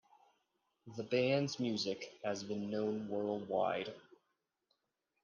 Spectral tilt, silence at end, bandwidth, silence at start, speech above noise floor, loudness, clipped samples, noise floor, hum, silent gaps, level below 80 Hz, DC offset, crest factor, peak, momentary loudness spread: -5.5 dB/octave; 1.25 s; 9.8 kHz; 0.85 s; 48 dB; -38 LUFS; under 0.1%; -86 dBFS; none; none; -82 dBFS; under 0.1%; 18 dB; -22 dBFS; 12 LU